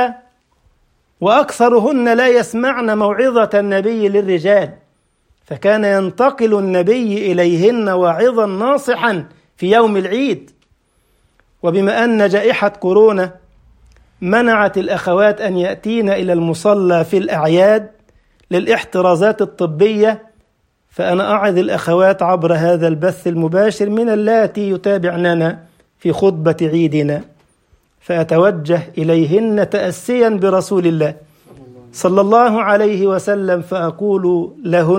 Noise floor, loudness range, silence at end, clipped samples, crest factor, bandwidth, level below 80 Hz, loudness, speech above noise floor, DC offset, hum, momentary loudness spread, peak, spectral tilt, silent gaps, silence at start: -61 dBFS; 2 LU; 0 s; under 0.1%; 14 dB; 16 kHz; -56 dBFS; -14 LUFS; 48 dB; under 0.1%; none; 7 LU; 0 dBFS; -6.5 dB/octave; none; 0 s